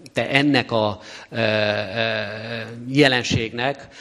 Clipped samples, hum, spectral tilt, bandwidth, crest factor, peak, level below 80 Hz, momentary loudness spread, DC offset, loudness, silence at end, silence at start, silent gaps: under 0.1%; none; -5 dB/octave; 12 kHz; 22 dB; 0 dBFS; -50 dBFS; 13 LU; under 0.1%; -21 LUFS; 0 s; 0 s; none